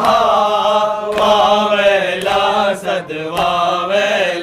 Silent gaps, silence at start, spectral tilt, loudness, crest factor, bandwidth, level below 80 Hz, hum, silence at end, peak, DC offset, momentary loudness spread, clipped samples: none; 0 s; -3.5 dB/octave; -14 LUFS; 12 dB; 15.5 kHz; -48 dBFS; none; 0 s; -2 dBFS; under 0.1%; 6 LU; under 0.1%